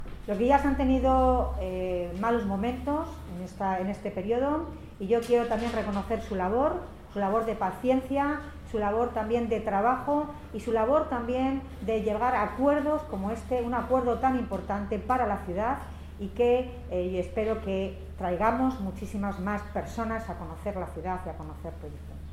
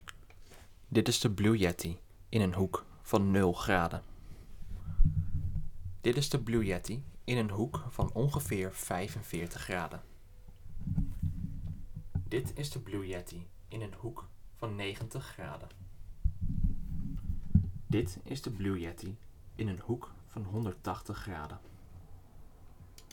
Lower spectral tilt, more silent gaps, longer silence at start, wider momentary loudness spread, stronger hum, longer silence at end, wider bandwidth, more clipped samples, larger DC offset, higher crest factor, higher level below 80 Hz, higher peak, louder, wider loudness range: first, -7.5 dB/octave vs -5.5 dB/octave; neither; about the same, 0 s vs 0 s; second, 11 LU vs 20 LU; neither; about the same, 0 s vs 0 s; second, 15.5 kHz vs 19 kHz; neither; neither; second, 18 dB vs 24 dB; about the same, -42 dBFS vs -42 dBFS; about the same, -10 dBFS vs -10 dBFS; first, -29 LUFS vs -35 LUFS; second, 3 LU vs 9 LU